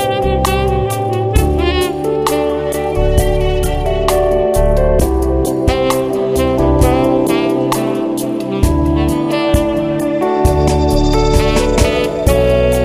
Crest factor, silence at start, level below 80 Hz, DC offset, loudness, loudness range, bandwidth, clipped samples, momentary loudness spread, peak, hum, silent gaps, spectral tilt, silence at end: 12 dB; 0 s; -20 dBFS; under 0.1%; -14 LUFS; 2 LU; 16 kHz; under 0.1%; 4 LU; 0 dBFS; none; none; -6 dB/octave; 0 s